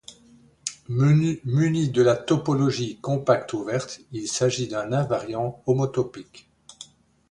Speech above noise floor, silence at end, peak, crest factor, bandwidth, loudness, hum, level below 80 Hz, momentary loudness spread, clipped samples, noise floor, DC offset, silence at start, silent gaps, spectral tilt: 32 dB; 0.45 s; -6 dBFS; 18 dB; 11 kHz; -24 LUFS; none; -58 dBFS; 14 LU; under 0.1%; -55 dBFS; under 0.1%; 0.1 s; none; -6 dB/octave